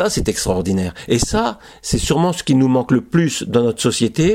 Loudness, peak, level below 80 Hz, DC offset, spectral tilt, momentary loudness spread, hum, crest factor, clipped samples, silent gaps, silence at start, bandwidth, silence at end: -17 LUFS; -2 dBFS; -34 dBFS; under 0.1%; -5 dB/octave; 6 LU; none; 16 dB; under 0.1%; none; 0 s; 16.5 kHz; 0 s